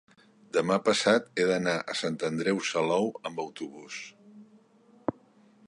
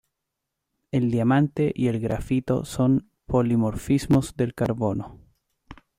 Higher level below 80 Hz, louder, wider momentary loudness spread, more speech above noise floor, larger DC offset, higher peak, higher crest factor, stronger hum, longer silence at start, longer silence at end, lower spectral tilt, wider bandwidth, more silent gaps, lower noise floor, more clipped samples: second, -72 dBFS vs -46 dBFS; second, -28 LUFS vs -24 LUFS; first, 16 LU vs 7 LU; second, 32 dB vs 60 dB; neither; about the same, -10 dBFS vs -8 dBFS; about the same, 20 dB vs 16 dB; neither; second, 0.55 s vs 0.95 s; first, 0.55 s vs 0.25 s; second, -4 dB/octave vs -7.5 dB/octave; second, 11.5 kHz vs 15.5 kHz; neither; second, -60 dBFS vs -82 dBFS; neither